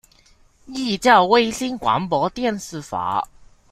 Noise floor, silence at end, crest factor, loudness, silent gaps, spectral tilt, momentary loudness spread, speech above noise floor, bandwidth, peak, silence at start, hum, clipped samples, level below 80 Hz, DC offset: -54 dBFS; 0.45 s; 20 dB; -20 LUFS; none; -4 dB/octave; 15 LU; 35 dB; 15.5 kHz; -2 dBFS; 0.7 s; none; under 0.1%; -52 dBFS; under 0.1%